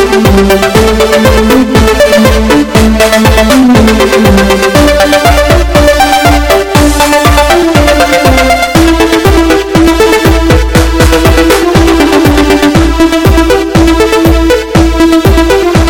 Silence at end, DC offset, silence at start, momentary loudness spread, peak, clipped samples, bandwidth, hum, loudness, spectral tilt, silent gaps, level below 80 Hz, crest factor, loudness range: 0 s; under 0.1%; 0 s; 2 LU; 0 dBFS; 4%; 18 kHz; none; -5 LUFS; -5 dB/octave; none; -14 dBFS; 4 dB; 1 LU